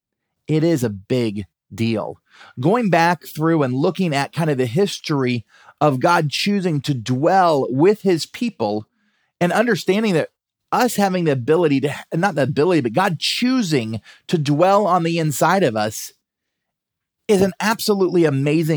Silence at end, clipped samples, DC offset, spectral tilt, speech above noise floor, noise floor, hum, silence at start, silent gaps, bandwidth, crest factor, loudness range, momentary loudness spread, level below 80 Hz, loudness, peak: 0 s; under 0.1%; under 0.1%; -5.5 dB/octave; 63 dB; -81 dBFS; none; 0.5 s; none; over 20 kHz; 16 dB; 2 LU; 8 LU; -64 dBFS; -19 LUFS; -2 dBFS